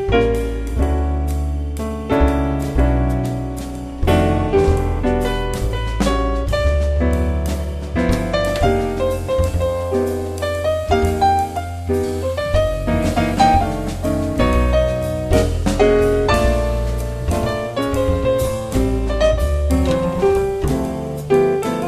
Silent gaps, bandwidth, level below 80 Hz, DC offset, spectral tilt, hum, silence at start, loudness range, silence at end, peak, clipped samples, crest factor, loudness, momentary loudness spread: none; 14 kHz; -22 dBFS; under 0.1%; -6.5 dB/octave; none; 0 s; 2 LU; 0 s; -2 dBFS; under 0.1%; 16 dB; -19 LUFS; 7 LU